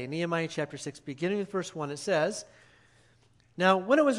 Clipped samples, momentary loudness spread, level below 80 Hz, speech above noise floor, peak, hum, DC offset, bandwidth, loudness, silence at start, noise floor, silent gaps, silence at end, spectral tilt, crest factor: under 0.1%; 15 LU; -74 dBFS; 35 dB; -8 dBFS; none; under 0.1%; 11.5 kHz; -30 LUFS; 0 s; -63 dBFS; none; 0 s; -5 dB/octave; 22 dB